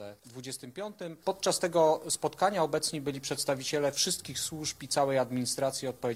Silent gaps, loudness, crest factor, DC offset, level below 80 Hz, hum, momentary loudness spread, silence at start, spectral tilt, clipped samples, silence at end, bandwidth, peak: none; -30 LUFS; 18 dB; under 0.1%; -68 dBFS; none; 14 LU; 0 s; -3 dB/octave; under 0.1%; 0 s; 16 kHz; -12 dBFS